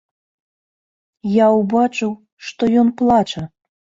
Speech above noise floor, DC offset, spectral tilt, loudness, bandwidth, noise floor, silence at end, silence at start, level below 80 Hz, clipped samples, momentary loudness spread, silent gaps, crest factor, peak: over 74 dB; under 0.1%; -6.5 dB/octave; -16 LUFS; 7.6 kHz; under -90 dBFS; 0.5 s; 1.25 s; -54 dBFS; under 0.1%; 16 LU; 2.32-2.37 s; 16 dB; -4 dBFS